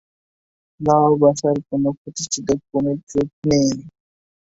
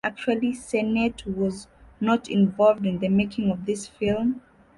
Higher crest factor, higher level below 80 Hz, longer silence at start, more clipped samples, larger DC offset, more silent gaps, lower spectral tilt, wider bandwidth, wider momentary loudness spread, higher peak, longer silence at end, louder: about the same, 18 dB vs 16 dB; about the same, -52 dBFS vs -52 dBFS; first, 0.8 s vs 0.05 s; neither; neither; first, 1.97-2.05 s, 3.03-3.07 s, 3.33-3.42 s vs none; about the same, -6 dB/octave vs -6.5 dB/octave; second, 8 kHz vs 11.5 kHz; about the same, 9 LU vs 8 LU; first, -2 dBFS vs -8 dBFS; first, 0.6 s vs 0.4 s; first, -19 LUFS vs -24 LUFS